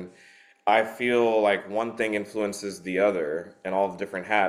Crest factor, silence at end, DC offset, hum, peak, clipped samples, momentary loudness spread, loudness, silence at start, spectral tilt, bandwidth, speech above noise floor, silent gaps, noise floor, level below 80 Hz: 20 dB; 0 s; under 0.1%; none; -6 dBFS; under 0.1%; 10 LU; -26 LUFS; 0 s; -4.5 dB/octave; 15 kHz; 30 dB; none; -55 dBFS; -70 dBFS